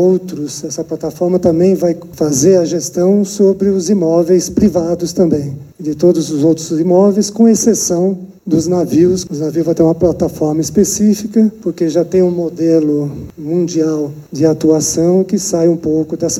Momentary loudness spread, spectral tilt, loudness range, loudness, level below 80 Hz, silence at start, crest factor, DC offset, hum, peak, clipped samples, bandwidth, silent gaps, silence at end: 8 LU; -6 dB/octave; 2 LU; -13 LUFS; -44 dBFS; 0 s; 12 dB; under 0.1%; none; 0 dBFS; under 0.1%; 16 kHz; none; 0 s